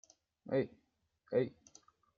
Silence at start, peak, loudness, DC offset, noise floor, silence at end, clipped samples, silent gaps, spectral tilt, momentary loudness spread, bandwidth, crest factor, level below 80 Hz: 0.45 s; -20 dBFS; -38 LUFS; under 0.1%; -76 dBFS; 0.65 s; under 0.1%; none; -7 dB/octave; 8 LU; 7.4 kHz; 20 dB; -80 dBFS